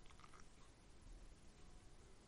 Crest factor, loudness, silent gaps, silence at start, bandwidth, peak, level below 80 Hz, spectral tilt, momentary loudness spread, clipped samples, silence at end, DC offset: 14 dB; -66 LUFS; none; 0 s; 11.5 kHz; -48 dBFS; -64 dBFS; -4 dB/octave; 3 LU; under 0.1%; 0 s; under 0.1%